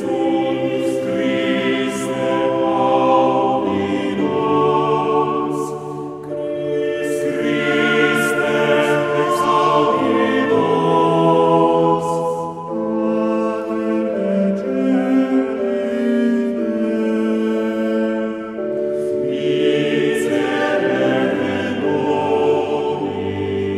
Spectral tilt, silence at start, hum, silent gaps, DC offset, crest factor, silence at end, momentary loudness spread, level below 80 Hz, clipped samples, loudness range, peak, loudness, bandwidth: -6 dB/octave; 0 s; none; none; under 0.1%; 14 dB; 0 s; 7 LU; -58 dBFS; under 0.1%; 4 LU; -2 dBFS; -18 LUFS; 15 kHz